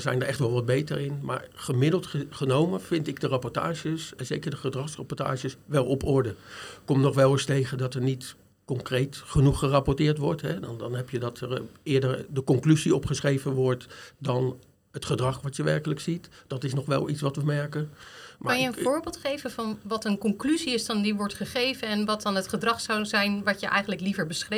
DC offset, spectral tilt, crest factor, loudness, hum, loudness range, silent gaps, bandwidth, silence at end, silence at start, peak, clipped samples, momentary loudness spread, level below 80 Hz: under 0.1%; -5.5 dB/octave; 18 dB; -27 LUFS; none; 3 LU; none; 16 kHz; 0 s; 0 s; -8 dBFS; under 0.1%; 10 LU; -50 dBFS